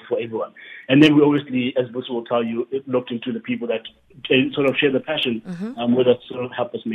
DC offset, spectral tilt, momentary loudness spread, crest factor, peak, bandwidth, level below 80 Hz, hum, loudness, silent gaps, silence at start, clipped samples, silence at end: under 0.1%; -7 dB/octave; 13 LU; 20 dB; -2 dBFS; 8.4 kHz; -62 dBFS; none; -20 LUFS; none; 0.05 s; under 0.1%; 0 s